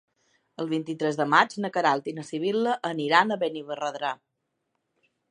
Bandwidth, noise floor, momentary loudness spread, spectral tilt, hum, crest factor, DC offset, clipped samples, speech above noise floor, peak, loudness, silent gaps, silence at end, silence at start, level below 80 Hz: 10.5 kHz; -78 dBFS; 11 LU; -5 dB/octave; none; 24 dB; under 0.1%; under 0.1%; 53 dB; -2 dBFS; -26 LUFS; none; 1.15 s; 0.6 s; -82 dBFS